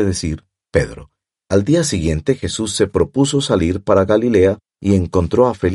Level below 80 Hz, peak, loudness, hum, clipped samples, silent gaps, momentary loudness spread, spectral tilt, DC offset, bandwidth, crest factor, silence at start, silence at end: -36 dBFS; 0 dBFS; -17 LUFS; none; under 0.1%; none; 7 LU; -5.5 dB/octave; under 0.1%; 11.5 kHz; 16 dB; 0 s; 0 s